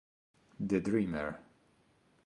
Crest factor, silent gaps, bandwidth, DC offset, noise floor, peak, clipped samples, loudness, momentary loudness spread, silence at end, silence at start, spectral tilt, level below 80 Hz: 20 dB; none; 11 kHz; under 0.1%; -69 dBFS; -18 dBFS; under 0.1%; -35 LUFS; 11 LU; 0.85 s; 0.6 s; -8 dB/octave; -62 dBFS